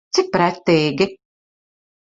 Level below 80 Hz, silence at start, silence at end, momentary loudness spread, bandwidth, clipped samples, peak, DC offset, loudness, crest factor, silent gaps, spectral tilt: -56 dBFS; 0.15 s; 1 s; 5 LU; 7.8 kHz; under 0.1%; -2 dBFS; under 0.1%; -18 LUFS; 18 dB; none; -5 dB/octave